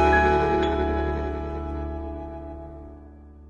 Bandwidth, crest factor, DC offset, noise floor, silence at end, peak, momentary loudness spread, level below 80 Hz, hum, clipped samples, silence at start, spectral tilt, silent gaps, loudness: 7.2 kHz; 18 dB; under 0.1%; -45 dBFS; 0 s; -8 dBFS; 22 LU; -34 dBFS; none; under 0.1%; 0 s; -7.5 dB/octave; none; -25 LUFS